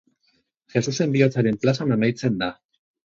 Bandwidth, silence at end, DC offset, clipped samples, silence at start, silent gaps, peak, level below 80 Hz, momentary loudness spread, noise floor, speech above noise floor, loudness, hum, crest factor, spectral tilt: 7.6 kHz; 0.5 s; under 0.1%; under 0.1%; 0.75 s; none; -4 dBFS; -60 dBFS; 7 LU; -68 dBFS; 47 dB; -22 LUFS; none; 18 dB; -6.5 dB/octave